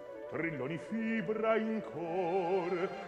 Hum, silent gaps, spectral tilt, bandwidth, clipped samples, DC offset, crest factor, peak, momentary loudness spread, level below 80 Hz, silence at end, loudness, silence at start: none; none; -7.5 dB/octave; 9.6 kHz; under 0.1%; under 0.1%; 18 dB; -18 dBFS; 6 LU; -72 dBFS; 0 s; -35 LUFS; 0 s